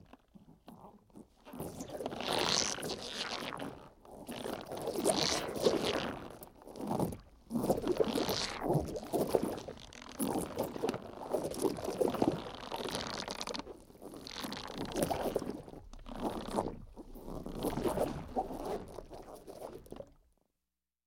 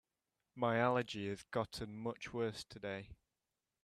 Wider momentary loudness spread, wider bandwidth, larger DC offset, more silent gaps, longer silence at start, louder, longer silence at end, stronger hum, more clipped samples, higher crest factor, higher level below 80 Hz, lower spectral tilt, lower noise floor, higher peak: first, 19 LU vs 12 LU; first, 17.5 kHz vs 14 kHz; neither; neither; second, 0.35 s vs 0.55 s; first, -37 LUFS vs -40 LUFS; first, 0.95 s vs 0.7 s; neither; neither; about the same, 26 dB vs 22 dB; first, -56 dBFS vs -68 dBFS; second, -4 dB/octave vs -5.5 dB/octave; about the same, under -90 dBFS vs under -90 dBFS; first, -12 dBFS vs -18 dBFS